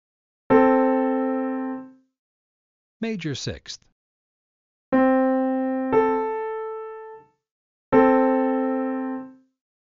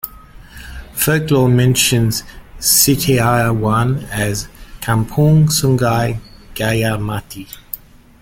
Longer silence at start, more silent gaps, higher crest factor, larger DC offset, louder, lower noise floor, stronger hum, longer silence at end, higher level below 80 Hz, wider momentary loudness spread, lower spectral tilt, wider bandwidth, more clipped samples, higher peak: first, 0.5 s vs 0.05 s; first, 2.19-3.00 s, 3.92-4.92 s, 7.51-7.92 s vs none; about the same, 18 dB vs 16 dB; neither; second, -22 LUFS vs -15 LUFS; first, -44 dBFS vs -38 dBFS; neither; first, 0.6 s vs 0.45 s; second, -58 dBFS vs -36 dBFS; about the same, 18 LU vs 18 LU; about the same, -5 dB/octave vs -4.5 dB/octave; second, 7.4 kHz vs 17 kHz; neither; second, -4 dBFS vs 0 dBFS